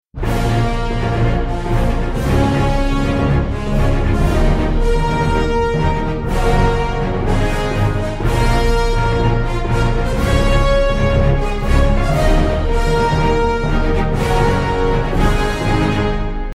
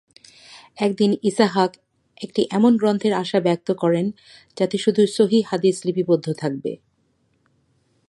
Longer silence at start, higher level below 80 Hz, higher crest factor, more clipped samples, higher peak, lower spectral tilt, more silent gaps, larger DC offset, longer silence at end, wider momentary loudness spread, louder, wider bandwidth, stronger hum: second, 0.15 s vs 0.5 s; first, -18 dBFS vs -68 dBFS; second, 12 dB vs 18 dB; neither; about the same, -2 dBFS vs -2 dBFS; about the same, -6.5 dB/octave vs -6 dB/octave; neither; neither; second, 0.05 s vs 1.35 s; second, 4 LU vs 9 LU; first, -17 LUFS vs -20 LUFS; about the same, 12.5 kHz vs 11.5 kHz; neither